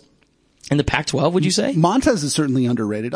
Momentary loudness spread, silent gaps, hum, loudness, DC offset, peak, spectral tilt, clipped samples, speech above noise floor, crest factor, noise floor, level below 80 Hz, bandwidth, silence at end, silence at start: 5 LU; none; none; -19 LUFS; under 0.1%; -2 dBFS; -5 dB/octave; under 0.1%; 41 dB; 16 dB; -59 dBFS; -40 dBFS; 10.5 kHz; 0 s; 0.65 s